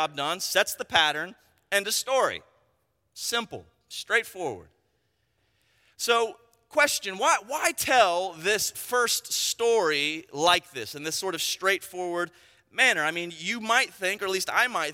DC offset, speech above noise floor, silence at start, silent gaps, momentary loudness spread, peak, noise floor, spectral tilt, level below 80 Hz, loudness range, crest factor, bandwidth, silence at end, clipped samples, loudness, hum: under 0.1%; 47 dB; 0 s; none; 12 LU; -6 dBFS; -73 dBFS; -1 dB/octave; -70 dBFS; 7 LU; 22 dB; 16.5 kHz; 0 s; under 0.1%; -25 LUFS; none